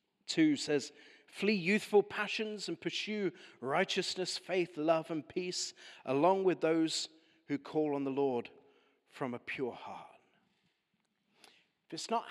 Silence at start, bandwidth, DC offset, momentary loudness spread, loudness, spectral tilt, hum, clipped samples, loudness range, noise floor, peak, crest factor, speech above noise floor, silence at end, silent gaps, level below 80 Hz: 0.3 s; 13 kHz; under 0.1%; 14 LU; -34 LUFS; -4 dB/octave; none; under 0.1%; 10 LU; -81 dBFS; -16 dBFS; 20 dB; 47 dB; 0 s; none; -86 dBFS